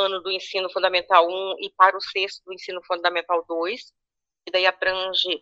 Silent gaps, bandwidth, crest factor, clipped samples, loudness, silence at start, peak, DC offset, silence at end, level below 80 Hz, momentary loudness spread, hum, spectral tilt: none; 7.8 kHz; 22 dB; under 0.1%; -22 LUFS; 0 s; -2 dBFS; under 0.1%; 0.05 s; -68 dBFS; 11 LU; none; -2 dB/octave